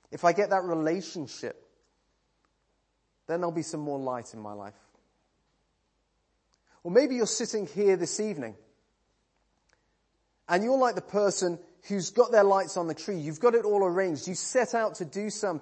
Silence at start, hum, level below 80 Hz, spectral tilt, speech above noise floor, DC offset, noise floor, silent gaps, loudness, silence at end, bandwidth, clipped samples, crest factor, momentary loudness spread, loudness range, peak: 0.1 s; none; -76 dBFS; -4.5 dB/octave; 47 dB; under 0.1%; -75 dBFS; none; -28 LUFS; 0 s; 8.8 kHz; under 0.1%; 22 dB; 14 LU; 11 LU; -8 dBFS